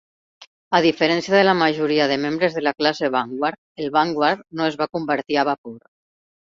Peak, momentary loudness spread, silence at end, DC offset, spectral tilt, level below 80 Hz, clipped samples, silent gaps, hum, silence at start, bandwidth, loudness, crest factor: -2 dBFS; 8 LU; 0.8 s; under 0.1%; -5 dB/octave; -62 dBFS; under 0.1%; 0.47-0.71 s, 3.58-3.75 s, 5.58-5.64 s; none; 0.4 s; 7.6 kHz; -20 LUFS; 18 dB